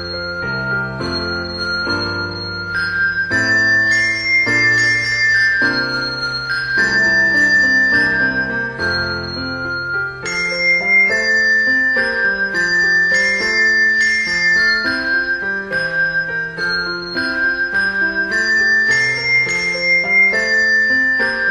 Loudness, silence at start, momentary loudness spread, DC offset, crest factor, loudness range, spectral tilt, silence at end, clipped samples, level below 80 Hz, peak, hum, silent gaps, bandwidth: -14 LUFS; 0 s; 9 LU; under 0.1%; 12 dB; 4 LU; -3 dB/octave; 0 s; under 0.1%; -44 dBFS; -4 dBFS; none; none; 11 kHz